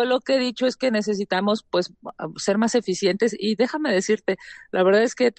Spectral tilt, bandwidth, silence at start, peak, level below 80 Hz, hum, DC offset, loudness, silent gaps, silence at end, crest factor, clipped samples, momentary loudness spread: -4.5 dB/octave; 9.2 kHz; 0 s; -8 dBFS; -66 dBFS; none; under 0.1%; -22 LUFS; none; 0.05 s; 14 dB; under 0.1%; 9 LU